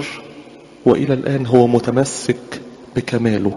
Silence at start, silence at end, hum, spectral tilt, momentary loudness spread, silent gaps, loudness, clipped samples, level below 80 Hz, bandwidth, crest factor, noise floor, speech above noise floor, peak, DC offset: 0 s; 0 s; none; -6.5 dB/octave; 19 LU; none; -17 LUFS; under 0.1%; -50 dBFS; 11.5 kHz; 16 dB; -39 dBFS; 24 dB; 0 dBFS; under 0.1%